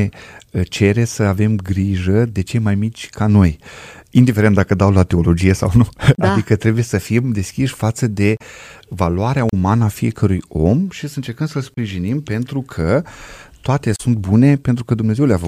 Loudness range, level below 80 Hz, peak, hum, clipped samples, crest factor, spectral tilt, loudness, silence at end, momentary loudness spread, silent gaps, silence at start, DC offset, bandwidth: 5 LU; -38 dBFS; 0 dBFS; none; under 0.1%; 16 dB; -7 dB/octave; -16 LUFS; 0 s; 10 LU; none; 0 s; under 0.1%; 14.5 kHz